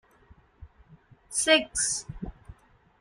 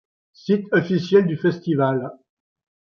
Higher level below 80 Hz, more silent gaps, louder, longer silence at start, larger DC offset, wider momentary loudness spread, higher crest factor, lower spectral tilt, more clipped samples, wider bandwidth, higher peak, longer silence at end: first, -52 dBFS vs -64 dBFS; neither; second, -25 LUFS vs -20 LUFS; first, 0.6 s vs 0.45 s; neither; first, 20 LU vs 10 LU; first, 24 dB vs 18 dB; second, -1.5 dB/octave vs -8 dB/octave; neither; first, 14.5 kHz vs 6.8 kHz; about the same, -6 dBFS vs -4 dBFS; second, 0.45 s vs 0.7 s